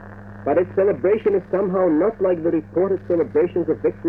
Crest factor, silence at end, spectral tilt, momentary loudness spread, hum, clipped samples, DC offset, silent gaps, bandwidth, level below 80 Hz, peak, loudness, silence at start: 12 dB; 0 s; -10.5 dB/octave; 3 LU; none; under 0.1%; under 0.1%; none; 3.4 kHz; -50 dBFS; -6 dBFS; -20 LUFS; 0 s